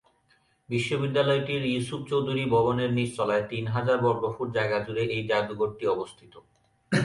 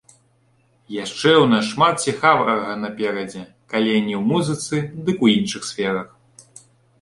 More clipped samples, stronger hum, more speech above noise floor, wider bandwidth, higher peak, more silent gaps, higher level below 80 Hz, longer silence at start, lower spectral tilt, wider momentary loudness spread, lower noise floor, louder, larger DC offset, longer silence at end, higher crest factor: neither; neither; about the same, 40 dB vs 41 dB; about the same, 11.5 kHz vs 11.5 kHz; second, -10 dBFS vs -2 dBFS; neither; about the same, -60 dBFS vs -60 dBFS; second, 0.7 s vs 0.9 s; first, -6.5 dB/octave vs -4.5 dB/octave; second, 6 LU vs 13 LU; first, -66 dBFS vs -60 dBFS; second, -27 LUFS vs -19 LUFS; neither; second, 0 s vs 0.6 s; about the same, 16 dB vs 18 dB